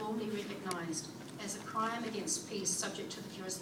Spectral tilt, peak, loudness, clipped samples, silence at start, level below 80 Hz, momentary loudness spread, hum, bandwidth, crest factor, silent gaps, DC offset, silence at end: -3 dB/octave; -20 dBFS; -38 LUFS; under 0.1%; 0 s; -78 dBFS; 8 LU; none; 19 kHz; 20 dB; none; under 0.1%; 0 s